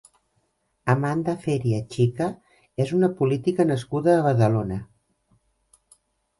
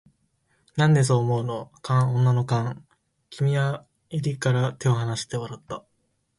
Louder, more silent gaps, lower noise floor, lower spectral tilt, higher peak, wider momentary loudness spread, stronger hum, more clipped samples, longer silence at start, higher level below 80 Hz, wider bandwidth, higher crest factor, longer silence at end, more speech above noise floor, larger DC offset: about the same, -23 LUFS vs -24 LUFS; neither; about the same, -71 dBFS vs -71 dBFS; first, -8 dB/octave vs -6.5 dB/octave; first, -6 dBFS vs -10 dBFS; second, 9 LU vs 16 LU; neither; neither; about the same, 0.85 s vs 0.75 s; about the same, -56 dBFS vs -60 dBFS; about the same, 11.5 kHz vs 11.5 kHz; about the same, 18 dB vs 14 dB; first, 1.55 s vs 0.6 s; about the same, 49 dB vs 49 dB; neither